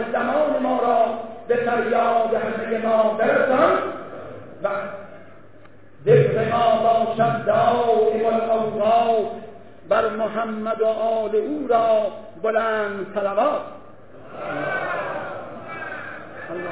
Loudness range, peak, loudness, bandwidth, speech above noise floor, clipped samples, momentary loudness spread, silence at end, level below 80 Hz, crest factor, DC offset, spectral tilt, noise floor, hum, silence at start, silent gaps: 6 LU; -4 dBFS; -21 LUFS; 4 kHz; 29 dB; under 0.1%; 15 LU; 0 s; -60 dBFS; 16 dB; 0.6%; -10 dB/octave; -49 dBFS; none; 0 s; none